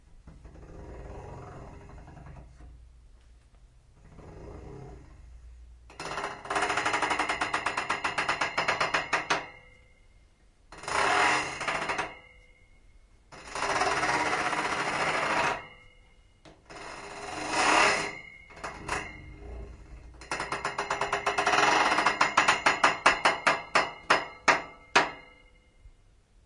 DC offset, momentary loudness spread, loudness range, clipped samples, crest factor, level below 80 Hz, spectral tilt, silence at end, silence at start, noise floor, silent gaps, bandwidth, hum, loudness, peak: under 0.1%; 24 LU; 11 LU; under 0.1%; 28 dB; -54 dBFS; -2 dB/octave; 0.55 s; 0.15 s; -60 dBFS; none; 11.5 kHz; none; -27 LUFS; -2 dBFS